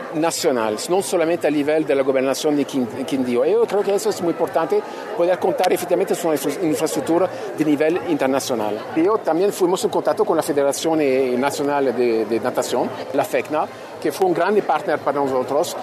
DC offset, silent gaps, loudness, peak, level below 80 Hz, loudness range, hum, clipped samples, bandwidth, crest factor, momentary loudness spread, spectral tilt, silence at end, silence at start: under 0.1%; none; -20 LUFS; -4 dBFS; -68 dBFS; 2 LU; none; under 0.1%; 14 kHz; 16 dB; 5 LU; -4.5 dB/octave; 0 s; 0 s